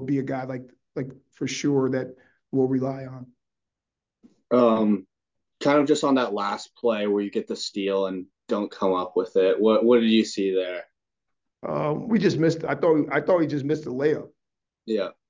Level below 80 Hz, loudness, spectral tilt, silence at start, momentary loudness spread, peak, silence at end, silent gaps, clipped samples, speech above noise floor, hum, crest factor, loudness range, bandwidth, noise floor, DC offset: -68 dBFS; -24 LUFS; -6 dB/octave; 0 s; 15 LU; -6 dBFS; 0.2 s; none; under 0.1%; 64 dB; none; 18 dB; 5 LU; 7.6 kHz; -88 dBFS; under 0.1%